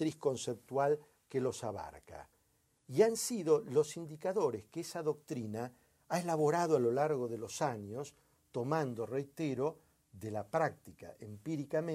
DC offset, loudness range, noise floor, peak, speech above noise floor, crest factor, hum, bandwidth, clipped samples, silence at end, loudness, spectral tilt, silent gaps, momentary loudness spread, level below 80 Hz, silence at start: under 0.1%; 4 LU; -75 dBFS; -16 dBFS; 39 dB; 20 dB; none; 15.5 kHz; under 0.1%; 0 s; -36 LUFS; -5.5 dB/octave; none; 16 LU; -74 dBFS; 0 s